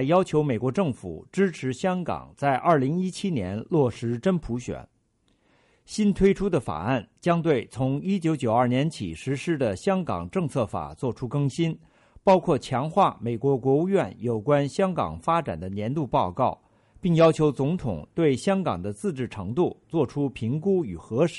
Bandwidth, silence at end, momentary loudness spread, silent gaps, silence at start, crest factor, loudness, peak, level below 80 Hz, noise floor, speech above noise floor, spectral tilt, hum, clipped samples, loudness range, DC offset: 11.5 kHz; 0 s; 9 LU; none; 0 s; 16 dB; -25 LUFS; -8 dBFS; -50 dBFS; -68 dBFS; 43 dB; -7 dB/octave; none; under 0.1%; 3 LU; under 0.1%